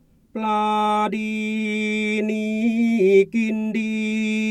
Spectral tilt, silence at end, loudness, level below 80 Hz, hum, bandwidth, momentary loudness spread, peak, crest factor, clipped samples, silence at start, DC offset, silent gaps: -6 dB/octave; 0 s; -21 LUFS; -62 dBFS; none; 10.5 kHz; 8 LU; -6 dBFS; 16 dB; under 0.1%; 0.35 s; under 0.1%; none